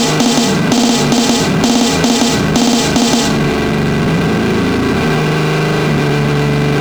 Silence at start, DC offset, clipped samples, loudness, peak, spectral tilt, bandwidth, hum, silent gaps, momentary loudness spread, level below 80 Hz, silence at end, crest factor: 0 s; under 0.1%; under 0.1%; -12 LUFS; 0 dBFS; -4.5 dB/octave; over 20 kHz; none; none; 2 LU; -32 dBFS; 0 s; 12 dB